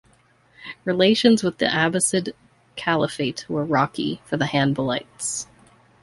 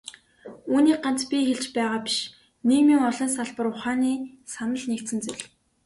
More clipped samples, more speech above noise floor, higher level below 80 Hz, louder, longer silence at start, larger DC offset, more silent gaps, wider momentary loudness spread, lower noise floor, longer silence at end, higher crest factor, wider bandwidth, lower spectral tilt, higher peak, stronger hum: neither; first, 37 dB vs 22 dB; first, -58 dBFS vs -66 dBFS; about the same, -22 LUFS vs -24 LUFS; first, 0.6 s vs 0.05 s; neither; neither; second, 13 LU vs 16 LU; first, -58 dBFS vs -46 dBFS; first, 0.6 s vs 0.4 s; first, 20 dB vs 14 dB; about the same, 11.5 kHz vs 11.5 kHz; about the same, -4 dB/octave vs -3 dB/octave; first, -2 dBFS vs -10 dBFS; neither